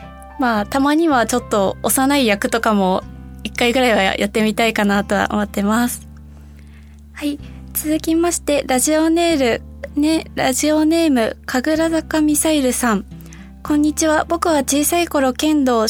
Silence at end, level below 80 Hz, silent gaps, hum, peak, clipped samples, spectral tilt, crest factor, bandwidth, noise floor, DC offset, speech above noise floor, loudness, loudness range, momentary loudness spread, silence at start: 0 s; -38 dBFS; none; none; 0 dBFS; under 0.1%; -3.5 dB/octave; 18 dB; 18 kHz; -40 dBFS; under 0.1%; 23 dB; -17 LUFS; 4 LU; 10 LU; 0 s